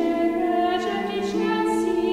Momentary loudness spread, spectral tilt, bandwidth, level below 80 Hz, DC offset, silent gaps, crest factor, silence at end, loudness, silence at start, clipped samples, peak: 4 LU; -5.5 dB/octave; 13.5 kHz; -54 dBFS; under 0.1%; none; 12 dB; 0 s; -23 LUFS; 0 s; under 0.1%; -10 dBFS